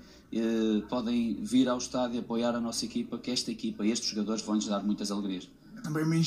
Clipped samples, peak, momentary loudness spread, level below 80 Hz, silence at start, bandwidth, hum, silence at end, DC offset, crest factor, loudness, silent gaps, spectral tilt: under 0.1%; -16 dBFS; 7 LU; -62 dBFS; 0.05 s; 13 kHz; none; 0 s; under 0.1%; 14 dB; -31 LUFS; none; -5 dB/octave